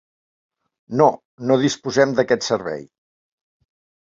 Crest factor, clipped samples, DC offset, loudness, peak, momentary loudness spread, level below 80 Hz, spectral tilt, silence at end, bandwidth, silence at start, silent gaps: 20 dB; under 0.1%; under 0.1%; -19 LUFS; -2 dBFS; 11 LU; -62 dBFS; -5 dB/octave; 1.3 s; 7.8 kHz; 0.9 s; 1.25-1.38 s